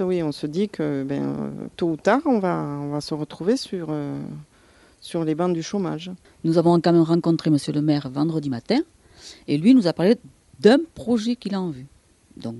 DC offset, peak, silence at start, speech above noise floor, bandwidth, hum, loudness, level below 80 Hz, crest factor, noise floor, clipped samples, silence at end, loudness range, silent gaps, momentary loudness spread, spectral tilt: under 0.1%; -2 dBFS; 0 s; 33 dB; 11.5 kHz; none; -22 LUFS; -60 dBFS; 20 dB; -54 dBFS; under 0.1%; 0 s; 6 LU; none; 15 LU; -7 dB/octave